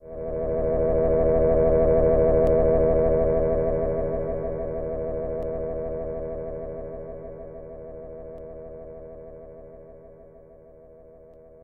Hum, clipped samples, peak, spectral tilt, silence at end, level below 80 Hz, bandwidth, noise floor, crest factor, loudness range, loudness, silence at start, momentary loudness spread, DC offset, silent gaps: none; under 0.1%; -8 dBFS; -12 dB/octave; 0 s; -34 dBFS; 2.6 kHz; -49 dBFS; 16 dB; 21 LU; -24 LUFS; 0.05 s; 21 LU; 0.2%; none